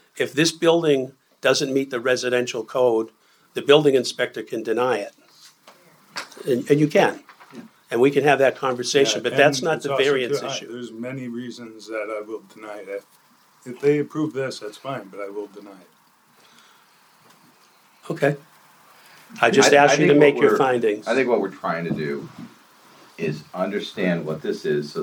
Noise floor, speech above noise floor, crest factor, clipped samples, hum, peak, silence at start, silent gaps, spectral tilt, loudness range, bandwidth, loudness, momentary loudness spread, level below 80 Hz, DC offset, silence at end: -57 dBFS; 36 dB; 20 dB; under 0.1%; none; -2 dBFS; 0.15 s; none; -4.5 dB/octave; 14 LU; 18.5 kHz; -21 LUFS; 19 LU; -74 dBFS; under 0.1%; 0 s